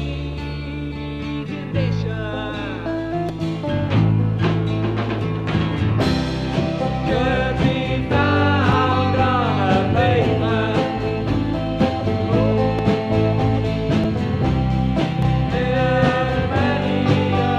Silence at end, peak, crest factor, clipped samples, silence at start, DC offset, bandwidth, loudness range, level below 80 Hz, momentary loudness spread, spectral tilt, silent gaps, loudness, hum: 0 s; -4 dBFS; 16 dB; under 0.1%; 0 s; 0.2%; 8.8 kHz; 4 LU; -34 dBFS; 9 LU; -8 dB/octave; none; -20 LUFS; none